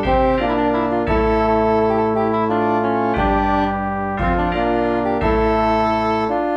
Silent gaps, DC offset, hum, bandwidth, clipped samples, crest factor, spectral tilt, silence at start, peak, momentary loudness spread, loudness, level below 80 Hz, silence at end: none; under 0.1%; none; 7.4 kHz; under 0.1%; 12 dB; -8 dB/octave; 0 s; -4 dBFS; 3 LU; -18 LUFS; -30 dBFS; 0 s